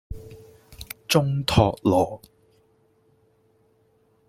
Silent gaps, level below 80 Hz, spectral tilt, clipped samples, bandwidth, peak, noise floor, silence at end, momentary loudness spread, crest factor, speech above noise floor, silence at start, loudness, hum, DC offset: none; -46 dBFS; -5.5 dB/octave; under 0.1%; 16.5 kHz; -4 dBFS; -63 dBFS; 2.1 s; 22 LU; 22 dB; 42 dB; 0.1 s; -22 LUFS; none; under 0.1%